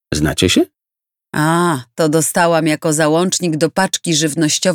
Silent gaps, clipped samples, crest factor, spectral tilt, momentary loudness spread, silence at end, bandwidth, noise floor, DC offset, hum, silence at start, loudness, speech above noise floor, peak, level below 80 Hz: none; under 0.1%; 16 dB; -4 dB/octave; 4 LU; 0 s; 18.5 kHz; -86 dBFS; under 0.1%; none; 0.1 s; -15 LUFS; 71 dB; 0 dBFS; -42 dBFS